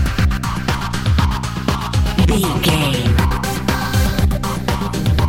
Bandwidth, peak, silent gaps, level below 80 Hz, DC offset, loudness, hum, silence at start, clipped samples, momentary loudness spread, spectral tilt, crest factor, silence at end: 17 kHz; 0 dBFS; none; -22 dBFS; under 0.1%; -18 LUFS; none; 0 s; under 0.1%; 5 LU; -5.5 dB/octave; 16 dB; 0 s